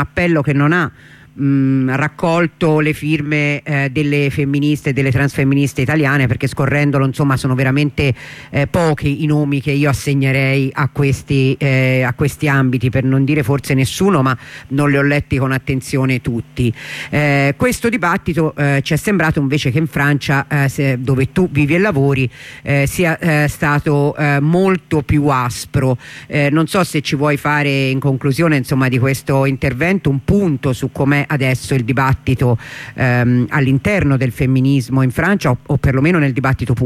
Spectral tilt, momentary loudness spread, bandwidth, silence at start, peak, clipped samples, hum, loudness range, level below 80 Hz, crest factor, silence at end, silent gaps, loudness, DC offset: -6.5 dB/octave; 4 LU; 15.5 kHz; 0 s; -4 dBFS; under 0.1%; none; 1 LU; -38 dBFS; 12 dB; 0 s; none; -15 LUFS; under 0.1%